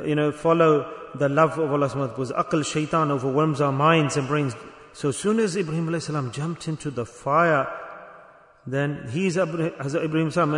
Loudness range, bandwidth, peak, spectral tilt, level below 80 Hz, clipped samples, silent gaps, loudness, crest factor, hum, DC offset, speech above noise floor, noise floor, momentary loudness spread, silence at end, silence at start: 4 LU; 11 kHz; -6 dBFS; -6 dB/octave; -60 dBFS; under 0.1%; none; -23 LUFS; 18 dB; none; under 0.1%; 28 dB; -50 dBFS; 11 LU; 0 s; 0 s